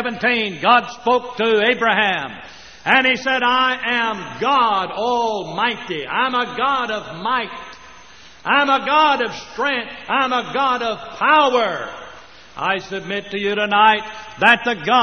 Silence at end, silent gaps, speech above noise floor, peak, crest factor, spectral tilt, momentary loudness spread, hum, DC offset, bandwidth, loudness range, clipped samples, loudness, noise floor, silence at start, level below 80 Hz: 0 s; none; 26 dB; 0 dBFS; 18 dB; -0.5 dB/octave; 12 LU; none; 0.3%; 6.6 kHz; 3 LU; under 0.1%; -18 LUFS; -44 dBFS; 0 s; -56 dBFS